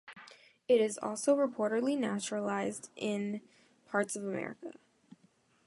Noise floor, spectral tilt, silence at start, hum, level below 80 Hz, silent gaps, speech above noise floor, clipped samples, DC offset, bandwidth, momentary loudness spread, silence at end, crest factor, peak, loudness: -69 dBFS; -4.5 dB/octave; 0.05 s; none; -82 dBFS; none; 36 dB; under 0.1%; under 0.1%; 11.5 kHz; 18 LU; 0.95 s; 18 dB; -16 dBFS; -33 LUFS